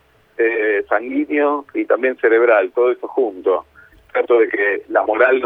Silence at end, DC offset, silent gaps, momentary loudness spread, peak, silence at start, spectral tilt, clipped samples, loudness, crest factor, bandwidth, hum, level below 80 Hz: 0 s; under 0.1%; none; 7 LU; 0 dBFS; 0.4 s; -6.5 dB/octave; under 0.1%; -17 LUFS; 16 dB; 3.9 kHz; none; -62 dBFS